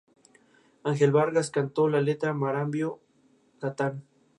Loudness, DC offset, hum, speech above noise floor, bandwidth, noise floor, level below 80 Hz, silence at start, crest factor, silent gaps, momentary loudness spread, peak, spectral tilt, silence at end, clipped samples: -27 LUFS; under 0.1%; none; 38 dB; 11 kHz; -64 dBFS; -76 dBFS; 0.85 s; 18 dB; none; 13 LU; -10 dBFS; -6.5 dB/octave; 0.35 s; under 0.1%